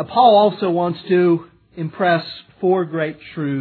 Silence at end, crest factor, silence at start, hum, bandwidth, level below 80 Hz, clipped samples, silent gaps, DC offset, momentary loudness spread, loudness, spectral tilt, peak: 0 s; 16 dB; 0 s; none; 4.5 kHz; -62 dBFS; under 0.1%; none; under 0.1%; 14 LU; -18 LUFS; -9.5 dB/octave; -2 dBFS